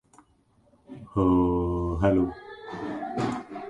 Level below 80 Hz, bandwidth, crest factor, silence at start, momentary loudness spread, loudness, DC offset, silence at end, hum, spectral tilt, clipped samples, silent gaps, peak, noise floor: -42 dBFS; 9.2 kHz; 20 dB; 0.9 s; 18 LU; -26 LUFS; under 0.1%; 0 s; none; -8.5 dB/octave; under 0.1%; none; -8 dBFS; -64 dBFS